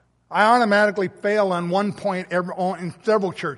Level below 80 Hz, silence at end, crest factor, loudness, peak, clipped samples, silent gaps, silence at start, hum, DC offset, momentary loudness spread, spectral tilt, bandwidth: -68 dBFS; 0 s; 18 dB; -21 LUFS; -2 dBFS; under 0.1%; none; 0.3 s; none; under 0.1%; 10 LU; -6 dB/octave; 11.5 kHz